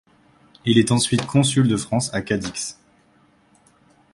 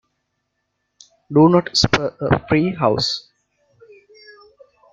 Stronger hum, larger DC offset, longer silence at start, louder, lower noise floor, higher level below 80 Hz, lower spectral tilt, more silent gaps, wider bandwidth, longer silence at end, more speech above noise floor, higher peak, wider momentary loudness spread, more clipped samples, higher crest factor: second, none vs 50 Hz at -45 dBFS; neither; second, 0.65 s vs 1.3 s; second, -20 LUFS vs -17 LUFS; second, -58 dBFS vs -74 dBFS; second, -52 dBFS vs -46 dBFS; about the same, -5 dB/octave vs -5.5 dB/octave; neither; first, 11.5 kHz vs 9 kHz; second, 1.4 s vs 1.75 s; second, 38 dB vs 57 dB; about the same, -2 dBFS vs 0 dBFS; first, 11 LU vs 7 LU; neither; about the same, 20 dB vs 20 dB